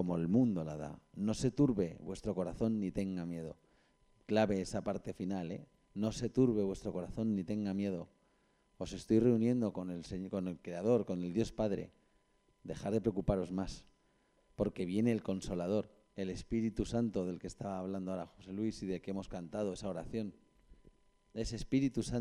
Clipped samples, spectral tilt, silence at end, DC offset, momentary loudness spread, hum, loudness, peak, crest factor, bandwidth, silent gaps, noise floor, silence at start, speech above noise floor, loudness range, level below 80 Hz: under 0.1%; -7 dB/octave; 0 s; under 0.1%; 13 LU; none; -37 LUFS; -18 dBFS; 20 dB; 11.5 kHz; none; -73 dBFS; 0 s; 38 dB; 5 LU; -56 dBFS